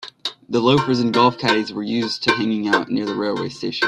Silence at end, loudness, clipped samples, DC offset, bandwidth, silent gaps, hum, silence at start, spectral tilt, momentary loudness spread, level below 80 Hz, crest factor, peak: 0 s; -19 LUFS; under 0.1%; under 0.1%; 12 kHz; none; none; 0 s; -5.5 dB/octave; 8 LU; -58 dBFS; 18 dB; -2 dBFS